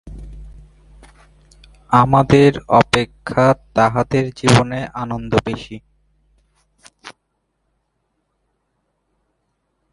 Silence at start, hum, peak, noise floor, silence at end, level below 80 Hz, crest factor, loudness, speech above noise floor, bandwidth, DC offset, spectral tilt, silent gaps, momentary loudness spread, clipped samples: 0.05 s; none; 0 dBFS; -70 dBFS; 2.8 s; -42 dBFS; 20 dB; -16 LUFS; 55 dB; 11.5 kHz; under 0.1%; -6 dB/octave; none; 16 LU; under 0.1%